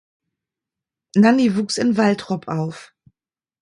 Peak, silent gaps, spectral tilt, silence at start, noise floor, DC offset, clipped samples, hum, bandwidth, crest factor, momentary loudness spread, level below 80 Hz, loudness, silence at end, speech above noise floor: -2 dBFS; none; -6 dB/octave; 1.15 s; under -90 dBFS; under 0.1%; under 0.1%; none; 11 kHz; 18 dB; 11 LU; -64 dBFS; -19 LUFS; 0.75 s; over 72 dB